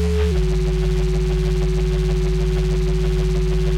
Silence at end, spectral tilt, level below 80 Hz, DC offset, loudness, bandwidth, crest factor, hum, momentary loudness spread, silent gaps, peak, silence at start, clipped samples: 0 s; -7 dB/octave; -20 dBFS; under 0.1%; -21 LUFS; 10.5 kHz; 8 dB; none; 1 LU; none; -10 dBFS; 0 s; under 0.1%